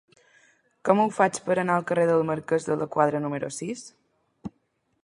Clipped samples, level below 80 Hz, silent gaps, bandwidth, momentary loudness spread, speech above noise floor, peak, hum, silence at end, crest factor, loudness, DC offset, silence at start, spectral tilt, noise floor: under 0.1%; -68 dBFS; none; 11.5 kHz; 18 LU; 48 dB; -4 dBFS; none; 0.55 s; 22 dB; -25 LUFS; under 0.1%; 0.85 s; -6 dB/octave; -72 dBFS